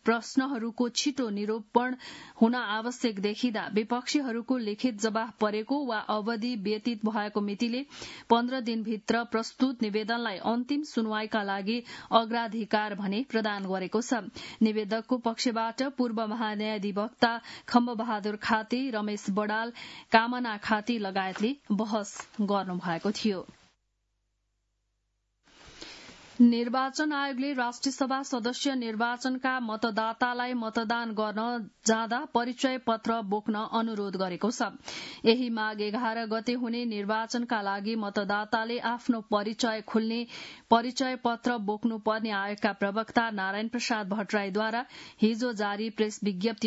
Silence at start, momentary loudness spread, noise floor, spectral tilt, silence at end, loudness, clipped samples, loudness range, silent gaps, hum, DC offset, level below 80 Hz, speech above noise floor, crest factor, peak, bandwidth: 0.05 s; 6 LU; -78 dBFS; -4.5 dB/octave; 0 s; -30 LUFS; under 0.1%; 2 LU; none; none; under 0.1%; -72 dBFS; 48 dB; 24 dB; -6 dBFS; 8 kHz